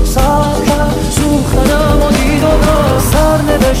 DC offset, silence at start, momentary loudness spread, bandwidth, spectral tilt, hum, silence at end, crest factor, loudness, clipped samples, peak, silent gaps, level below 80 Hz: under 0.1%; 0 s; 2 LU; 16.5 kHz; -5.5 dB/octave; none; 0 s; 10 dB; -11 LUFS; under 0.1%; 0 dBFS; none; -16 dBFS